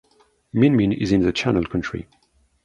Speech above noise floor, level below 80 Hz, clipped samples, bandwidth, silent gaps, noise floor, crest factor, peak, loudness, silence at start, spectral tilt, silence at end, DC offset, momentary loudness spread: 34 dB; -44 dBFS; under 0.1%; 9.2 kHz; none; -54 dBFS; 16 dB; -4 dBFS; -20 LUFS; 0.55 s; -7 dB/octave; 0.6 s; under 0.1%; 12 LU